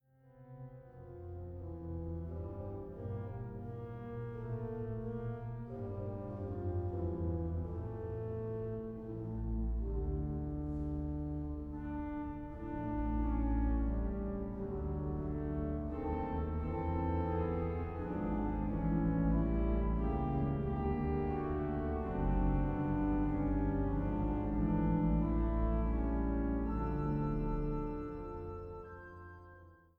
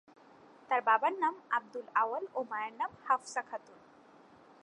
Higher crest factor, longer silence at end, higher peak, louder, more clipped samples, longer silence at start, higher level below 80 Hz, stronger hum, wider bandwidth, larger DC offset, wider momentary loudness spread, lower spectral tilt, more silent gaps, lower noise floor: second, 14 dB vs 20 dB; second, 0.25 s vs 0.9 s; second, -22 dBFS vs -14 dBFS; second, -38 LUFS vs -33 LUFS; neither; second, 0.25 s vs 0.7 s; first, -40 dBFS vs -86 dBFS; neither; second, 3.5 kHz vs 10 kHz; neither; about the same, 11 LU vs 11 LU; first, -11.5 dB/octave vs -2.5 dB/octave; neither; about the same, -60 dBFS vs -59 dBFS